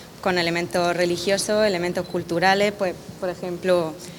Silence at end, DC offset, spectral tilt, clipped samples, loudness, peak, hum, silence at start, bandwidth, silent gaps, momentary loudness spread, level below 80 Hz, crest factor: 0 s; under 0.1%; -4 dB/octave; under 0.1%; -22 LUFS; -4 dBFS; none; 0 s; 19.5 kHz; none; 8 LU; -56 dBFS; 18 dB